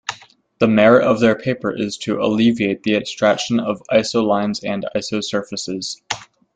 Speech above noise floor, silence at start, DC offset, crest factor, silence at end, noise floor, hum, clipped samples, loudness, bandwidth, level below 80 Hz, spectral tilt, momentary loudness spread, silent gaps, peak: 24 dB; 0.1 s; under 0.1%; 16 dB; 0.3 s; -41 dBFS; none; under 0.1%; -18 LUFS; 9.2 kHz; -56 dBFS; -5 dB/octave; 12 LU; none; -2 dBFS